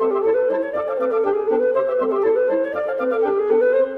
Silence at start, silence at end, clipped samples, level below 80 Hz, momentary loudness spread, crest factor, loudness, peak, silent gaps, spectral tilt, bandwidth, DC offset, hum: 0 s; 0 s; under 0.1%; -60 dBFS; 5 LU; 12 dB; -19 LUFS; -6 dBFS; none; -7 dB/octave; 4.3 kHz; under 0.1%; none